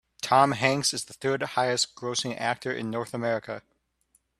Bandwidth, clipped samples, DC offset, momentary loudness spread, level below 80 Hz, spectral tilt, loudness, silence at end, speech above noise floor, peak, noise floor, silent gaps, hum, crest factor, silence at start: 13.5 kHz; under 0.1%; under 0.1%; 10 LU; -66 dBFS; -3.5 dB/octave; -26 LUFS; 0.8 s; 43 dB; -6 dBFS; -69 dBFS; none; none; 22 dB; 0.25 s